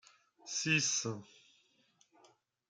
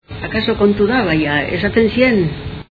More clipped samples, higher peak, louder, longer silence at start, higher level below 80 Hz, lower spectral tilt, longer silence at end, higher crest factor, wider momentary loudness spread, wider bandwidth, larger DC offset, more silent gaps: neither; second, -16 dBFS vs 0 dBFS; second, -33 LUFS vs -15 LUFS; first, 0.45 s vs 0.1 s; second, -80 dBFS vs -36 dBFS; second, -2 dB/octave vs -8.5 dB/octave; first, 1.45 s vs 0.1 s; first, 24 dB vs 16 dB; first, 18 LU vs 8 LU; first, 10.5 kHz vs 4.9 kHz; neither; neither